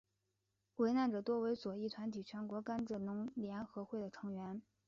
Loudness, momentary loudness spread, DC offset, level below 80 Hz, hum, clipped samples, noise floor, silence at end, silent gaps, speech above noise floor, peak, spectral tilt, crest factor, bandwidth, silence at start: -42 LUFS; 10 LU; under 0.1%; -78 dBFS; none; under 0.1%; -86 dBFS; 0.25 s; none; 45 dB; -26 dBFS; -6 dB/octave; 16 dB; 7.2 kHz; 0.8 s